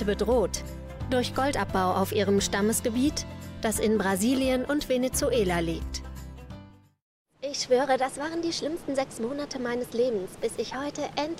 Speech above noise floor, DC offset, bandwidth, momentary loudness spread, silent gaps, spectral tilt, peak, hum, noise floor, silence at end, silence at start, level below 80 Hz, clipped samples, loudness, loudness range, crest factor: 22 dB; under 0.1%; 16 kHz; 13 LU; 7.02-7.26 s; -4.5 dB/octave; -12 dBFS; none; -49 dBFS; 0 s; 0 s; -44 dBFS; under 0.1%; -27 LUFS; 4 LU; 16 dB